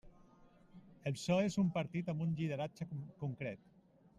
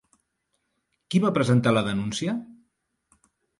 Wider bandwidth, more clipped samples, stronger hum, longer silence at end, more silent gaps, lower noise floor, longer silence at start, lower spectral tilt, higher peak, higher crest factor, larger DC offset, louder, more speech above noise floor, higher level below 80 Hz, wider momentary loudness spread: about the same, 11.5 kHz vs 11.5 kHz; neither; neither; second, 0.65 s vs 1.05 s; neither; second, -64 dBFS vs -76 dBFS; second, 0.05 s vs 1.1 s; about the same, -6.5 dB/octave vs -6 dB/octave; second, -20 dBFS vs -8 dBFS; about the same, 18 dB vs 18 dB; neither; second, -39 LUFS vs -24 LUFS; second, 26 dB vs 53 dB; second, -70 dBFS vs -60 dBFS; first, 12 LU vs 9 LU